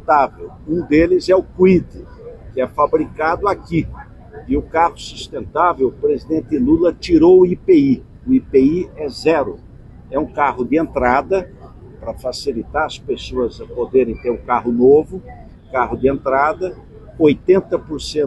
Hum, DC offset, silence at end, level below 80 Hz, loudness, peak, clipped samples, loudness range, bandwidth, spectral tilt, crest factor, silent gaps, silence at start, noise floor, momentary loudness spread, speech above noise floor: none; under 0.1%; 0 s; -38 dBFS; -16 LUFS; -2 dBFS; under 0.1%; 6 LU; 11.5 kHz; -7 dB/octave; 14 dB; none; 0.05 s; -37 dBFS; 15 LU; 21 dB